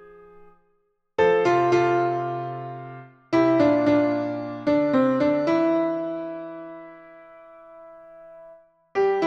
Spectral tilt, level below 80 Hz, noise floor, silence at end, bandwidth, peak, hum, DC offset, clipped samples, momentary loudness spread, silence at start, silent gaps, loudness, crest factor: -7 dB/octave; -62 dBFS; -68 dBFS; 0 s; 7.6 kHz; -8 dBFS; none; under 0.1%; under 0.1%; 19 LU; 1.2 s; none; -22 LUFS; 16 dB